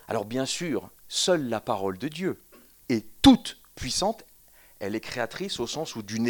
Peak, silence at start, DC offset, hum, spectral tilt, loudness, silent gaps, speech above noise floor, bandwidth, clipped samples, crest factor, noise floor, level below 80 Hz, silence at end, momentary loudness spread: -4 dBFS; 0.1 s; under 0.1%; none; -4 dB/octave; -27 LUFS; none; 29 dB; 19 kHz; under 0.1%; 24 dB; -55 dBFS; -48 dBFS; 0 s; 14 LU